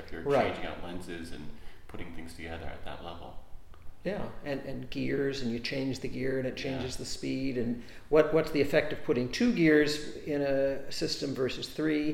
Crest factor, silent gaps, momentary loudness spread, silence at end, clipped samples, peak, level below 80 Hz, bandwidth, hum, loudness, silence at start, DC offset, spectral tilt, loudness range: 20 dB; none; 17 LU; 0 s; under 0.1%; -10 dBFS; -48 dBFS; 16 kHz; none; -31 LUFS; 0 s; under 0.1%; -5.5 dB/octave; 14 LU